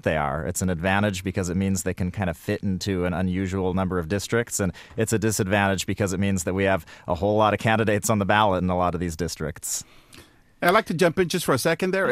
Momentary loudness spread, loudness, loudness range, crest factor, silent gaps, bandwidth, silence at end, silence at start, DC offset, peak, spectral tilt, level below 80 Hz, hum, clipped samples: 8 LU; -24 LUFS; 3 LU; 20 dB; none; 15.5 kHz; 0 s; 0.05 s; under 0.1%; -4 dBFS; -5 dB/octave; -46 dBFS; none; under 0.1%